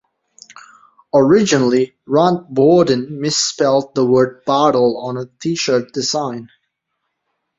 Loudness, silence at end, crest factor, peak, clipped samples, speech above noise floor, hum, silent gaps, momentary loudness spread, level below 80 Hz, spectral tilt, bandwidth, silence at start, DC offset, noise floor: -15 LUFS; 1.15 s; 16 dB; -2 dBFS; under 0.1%; 59 dB; none; none; 10 LU; -58 dBFS; -4.5 dB/octave; 7.8 kHz; 1.15 s; under 0.1%; -74 dBFS